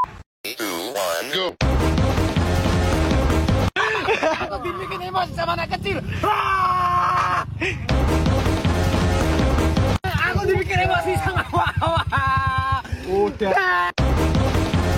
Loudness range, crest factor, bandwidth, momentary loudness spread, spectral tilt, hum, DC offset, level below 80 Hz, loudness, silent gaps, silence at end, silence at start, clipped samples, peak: 2 LU; 12 dB; 16.5 kHz; 6 LU; -5.5 dB/octave; none; under 0.1%; -28 dBFS; -21 LUFS; 0.26-0.44 s; 0 s; 0 s; under 0.1%; -8 dBFS